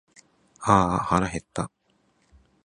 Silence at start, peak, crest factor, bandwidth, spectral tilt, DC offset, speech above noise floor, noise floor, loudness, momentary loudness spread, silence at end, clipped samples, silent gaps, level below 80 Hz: 0.6 s; -2 dBFS; 26 dB; 11 kHz; -6 dB/octave; under 0.1%; 44 dB; -67 dBFS; -24 LUFS; 13 LU; 1 s; under 0.1%; none; -46 dBFS